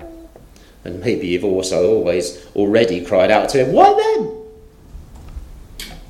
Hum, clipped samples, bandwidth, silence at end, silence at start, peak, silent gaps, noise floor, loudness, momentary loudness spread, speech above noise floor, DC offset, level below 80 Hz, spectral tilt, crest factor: none; under 0.1%; 15 kHz; 0.05 s; 0 s; 0 dBFS; none; -43 dBFS; -16 LUFS; 24 LU; 28 dB; under 0.1%; -40 dBFS; -5 dB/octave; 18 dB